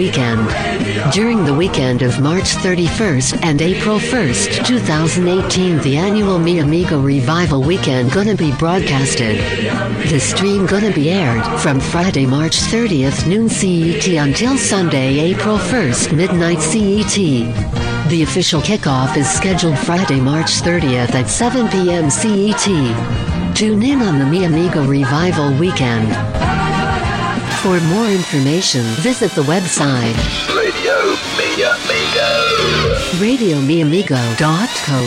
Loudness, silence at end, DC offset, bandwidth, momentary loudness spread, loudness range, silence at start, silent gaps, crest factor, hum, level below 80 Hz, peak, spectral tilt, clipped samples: -14 LUFS; 0 s; under 0.1%; 14 kHz; 3 LU; 1 LU; 0 s; none; 10 dB; none; -32 dBFS; -4 dBFS; -4.5 dB/octave; under 0.1%